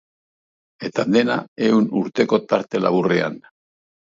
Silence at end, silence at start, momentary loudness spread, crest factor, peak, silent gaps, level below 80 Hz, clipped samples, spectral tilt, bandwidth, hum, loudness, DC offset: 0.75 s; 0.8 s; 9 LU; 18 dB; -2 dBFS; 1.48-1.56 s; -66 dBFS; under 0.1%; -6.5 dB/octave; 7.6 kHz; none; -20 LUFS; under 0.1%